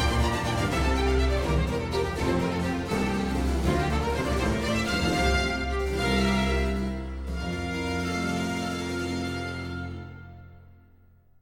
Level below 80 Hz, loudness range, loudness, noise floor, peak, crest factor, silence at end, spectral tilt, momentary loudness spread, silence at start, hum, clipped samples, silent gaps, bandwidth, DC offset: -32 dBFS; 5 LU; -27 LUFS; -57 dBFS; -12 dBFS; 16 dB; 0.65 s; -5.5 dB/octave; 9 LU; 0 s; none; under 0.1%; none; 16 kHz; under 0.1%